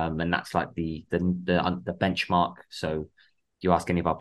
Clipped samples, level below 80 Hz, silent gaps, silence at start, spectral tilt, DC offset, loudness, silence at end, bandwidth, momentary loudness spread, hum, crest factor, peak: under 0.1%; -50 dBFS; none; 0 s; -6.5 dB/octave; under 0.1%; -27 LUFS; 0 s; 12.5 kHz; 8 LU; none; 22 dB; -6 dBFS